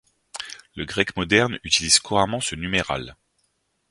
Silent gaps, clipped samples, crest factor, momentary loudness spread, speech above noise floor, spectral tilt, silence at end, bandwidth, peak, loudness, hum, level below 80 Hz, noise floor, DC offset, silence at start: none; under 0.1%; 24 dB; 18 LU; 48 dB; -2.5 dB/octave; 0.75 s; 11.5 kHz; 0 dBFS; -21 LUFS; none; -48 dBFS; -71 dBFS; under 0.1%; 0.35 s